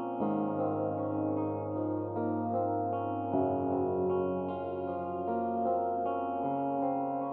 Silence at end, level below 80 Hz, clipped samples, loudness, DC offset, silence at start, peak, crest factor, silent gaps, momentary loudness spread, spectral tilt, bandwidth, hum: 0 s; -72 dBFS; under 0.1%; -33 LUFS; under 0.1%; 0 s; -18 dBFS; 14 dB; none; 4 LU; -9.5 dB/octave; 4.1 kHz; none